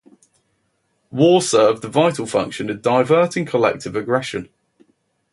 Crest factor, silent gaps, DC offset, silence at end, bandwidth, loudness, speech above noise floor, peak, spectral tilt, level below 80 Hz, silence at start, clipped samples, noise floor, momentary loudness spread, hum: 18 dB; none; under 0.1%; 0.9 s; 11.5 kHz; -18 LUFS; 50 dB; -2 dBFS; -5 dB/octave; -58 dBFS; 1.15 s; under 0.1%; -68 dBFS; 11 LU; none